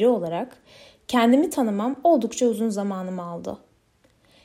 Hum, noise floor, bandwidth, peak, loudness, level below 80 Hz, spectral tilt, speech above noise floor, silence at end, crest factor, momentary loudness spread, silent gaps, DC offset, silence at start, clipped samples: none; -62 dBFS; 15.5 kHz; -8 dBFS; -23 LUFS; -66 dBFS; -5.5 dB/octave; 39 dB; 0.9 s; 16 dB; 17 LU; none; under 0.1%; 0 s; under 0.1%